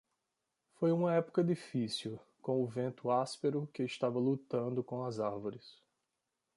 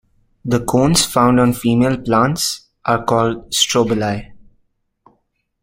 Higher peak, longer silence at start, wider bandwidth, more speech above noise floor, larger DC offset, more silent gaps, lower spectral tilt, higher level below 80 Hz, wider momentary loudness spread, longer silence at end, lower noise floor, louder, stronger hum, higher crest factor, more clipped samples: second, -20 dBFS vs -2 dBFS; first, 0.8 s vs 0.45 s; second, 11.5 kHz vs 16.5 kHz; about the same, 52 dB vs 50 dB; neither; neither; first, -7 dB/octave vs -4.5 dB/octave; second, -80 dBFS vs -42 dBFS; about the same, 8 LU vs 8 LU; second, 0.85 s vs 1.25 s; first, -87 dBFS vs -66 dBFS; second, -36 LUFS vs -16 LUFS; neither; about the same, 16 dB vs 16 dB; neither